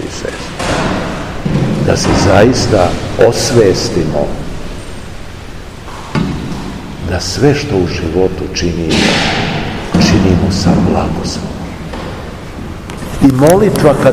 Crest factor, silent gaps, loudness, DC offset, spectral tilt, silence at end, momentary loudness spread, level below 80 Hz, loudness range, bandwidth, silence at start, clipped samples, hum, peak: 12 dB; none; -12 LUFS; under 0.1%; -5.5 dB/octave; 0 s; 17 LU; -26 dBFS; 6 LU; 16 kHz; 0 s; 0.9%; none; 0 dBFS